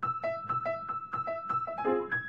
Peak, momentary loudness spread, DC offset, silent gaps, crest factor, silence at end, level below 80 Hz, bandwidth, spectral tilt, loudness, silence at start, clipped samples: -18 dBFS; 4 LU; under 0.1%; none; 16 dB; 0 s; -70 dBFS; 7.2 kHz; -8 dB/octave; -33 LUFS; 0 s; under 0.1%